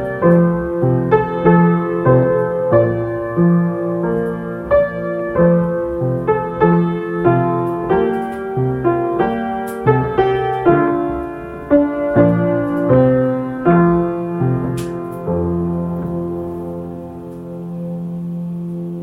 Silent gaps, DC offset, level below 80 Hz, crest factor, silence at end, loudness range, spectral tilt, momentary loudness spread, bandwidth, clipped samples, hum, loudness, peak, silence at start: none; under 0.1%; -40 dBFS; 16 dB; 0 s; 7 LU; -9.5 dB/octave; 12 LU; 11 kHz; under 0.1%; none; -16 LUFS; 0 dBFS; 0 s